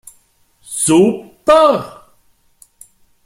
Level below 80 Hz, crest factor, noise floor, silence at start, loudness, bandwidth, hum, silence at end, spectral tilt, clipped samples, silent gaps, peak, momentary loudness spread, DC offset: -50 dBFS; 16 dB; -55 dBFS; 0.7 s; -13 LUFS; 15.5 kHz; none; 1.35 s; -4.5 dB/octave; under 0.1%; none; 0 dBFS; 14 LU; under 0.1%